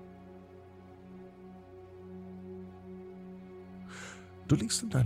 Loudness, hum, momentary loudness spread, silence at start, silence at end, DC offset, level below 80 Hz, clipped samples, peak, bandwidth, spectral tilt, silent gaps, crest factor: -38 LUFS; 60 Hz at -80 dBFS; 21 LU; 0 s; 0 s; under 0.1%; -60 dBFS; under 0.1%; -14 dBFS; 15.5 kHz; -5 dB/octave; none; 22 dB